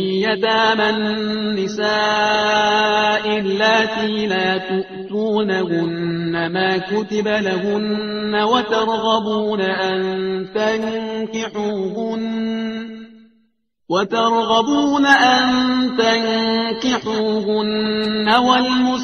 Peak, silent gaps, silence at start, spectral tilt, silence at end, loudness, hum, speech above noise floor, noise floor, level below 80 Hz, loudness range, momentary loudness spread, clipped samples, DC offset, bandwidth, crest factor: 0 dBFS; none; 0 s; -4.5 dB/octave; 0 s; -18 LUFS; none; 46 dB; -64 dBFS; -56 dBFS; 6 LU; 8 LU; under 0.1%; under 0.1%; 6.8 kHz; 18 dB